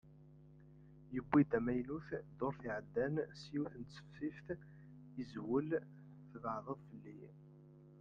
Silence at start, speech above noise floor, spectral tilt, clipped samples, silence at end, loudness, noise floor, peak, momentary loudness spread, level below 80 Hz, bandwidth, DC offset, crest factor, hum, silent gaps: 0.05 s; 21 dB; -8.5 dB/octave; under 0.1%; 0 s; -41 LUFS; -61 dBFS; -20 dBFS; 26 LU; -68 dBFS; 7.4 kHz; under 0.1%; 22 dB; none; none